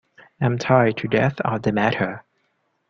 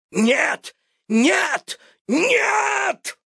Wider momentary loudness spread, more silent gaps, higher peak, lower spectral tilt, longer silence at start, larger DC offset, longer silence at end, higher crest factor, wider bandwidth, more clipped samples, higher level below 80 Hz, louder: second, 8 LU vs 11 LU; second, none vs 2.01-2.05 s; about the same, -2 dBFS vs -4 dBFS; first, -7 dB/octave vs -3 dB/octave; first, 0.4 s vs 0.15 s; neither; first, 0.7 s vs 0.15 s; about the same, 20 dB vs 16 dB; second, 7 kHz vs 11 kHz; neither; first, -54 dBFS vs -78 dBFS; about the same, -21 LUFS vs -19 LUFS